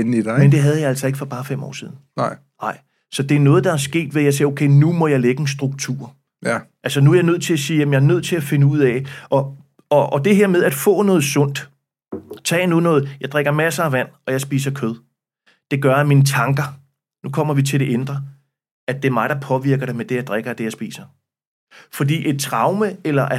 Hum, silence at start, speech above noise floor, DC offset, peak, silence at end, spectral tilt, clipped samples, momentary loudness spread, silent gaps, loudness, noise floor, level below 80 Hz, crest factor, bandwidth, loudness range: none; 0 s; 44 dB; under 0.1%; -2 dBFS; 0 s; -6 dB/octave; under 0.1%; 14 LU; 18.71-18.87 s, 21.47-21.67 s; -18 LUFS; -61 dBFS; -68 dBFS; 16 dB; 15.5 kHz; 6 LU